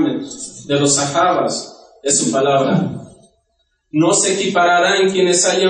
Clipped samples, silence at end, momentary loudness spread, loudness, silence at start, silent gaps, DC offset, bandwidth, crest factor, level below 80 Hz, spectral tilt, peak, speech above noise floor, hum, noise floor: under 0.1%; 0 s; 13 LU; -15 LUFS; 0 s; none; under 0.1%; 10 kHz; 14 dB; -60 dBFS; -3.5 dB/octave; -4 dBFS; 51 dB; none; -66 dBFS